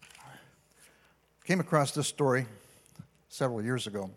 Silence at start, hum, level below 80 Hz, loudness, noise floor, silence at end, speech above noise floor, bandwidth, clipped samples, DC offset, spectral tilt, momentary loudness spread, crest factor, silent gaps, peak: 0 s; none; -74 dBFS; -30 LUFS; -66 dBFS; 0.05 s; 36 dB; 16 kHz; under 0.1%; under 0.1%; -5 dB/octave; 22 LU; 24 dB; none; -10 dBFS